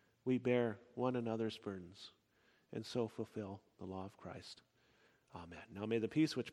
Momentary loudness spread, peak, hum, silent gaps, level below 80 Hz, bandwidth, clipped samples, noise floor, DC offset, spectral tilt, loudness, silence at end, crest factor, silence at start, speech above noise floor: 19 LU; -22 dBFS; none; none; -78 dBFS; 13 kHz; under 0.1%; -75 dBFS; under 0.1%; -6.5 dB/octave; -41 LUFS; 0 s; 20 dB; 0.25 s; 34 dB